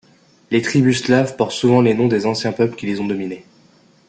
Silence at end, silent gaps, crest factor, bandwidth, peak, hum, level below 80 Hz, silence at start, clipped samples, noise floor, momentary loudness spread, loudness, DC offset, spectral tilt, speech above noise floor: 0.65 s; none; 16 dB; 9.2 kHz; -2 dBFS; none; -56 dBFS; 0.5 s; under 0.1%; -52 dBFS; 9 LU; -17 LUFS; under 0.1%; -6 dB/octave; 35 dB